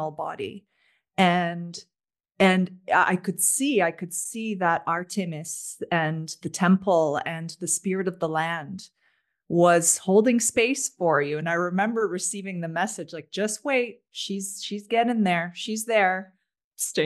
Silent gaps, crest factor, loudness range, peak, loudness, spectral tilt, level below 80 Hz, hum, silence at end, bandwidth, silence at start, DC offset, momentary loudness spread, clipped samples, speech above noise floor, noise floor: 16.64-16.71 s; 20 dB; 5 LU; -6 dBFS; -24 LUFS; -4 dB/octave; -72 dBFS; none; 0 s; 12.5 kHz; 0 s; under 0.1%; 12 LU; under 0.1%; 45 dB; -70 dBFS